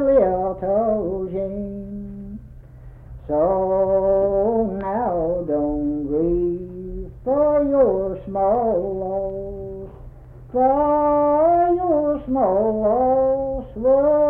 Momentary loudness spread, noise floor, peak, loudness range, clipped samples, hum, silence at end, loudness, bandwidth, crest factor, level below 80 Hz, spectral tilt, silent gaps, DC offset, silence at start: 16 LU; -41 dBFS; -6 dBFS; 5 LU; under 0.1%; none; 0 s; -20 LUFS; 3.1 kHz; 14 dB; -40 dBFS; -11.5 dB/octave; none; under 0.1%; 0 s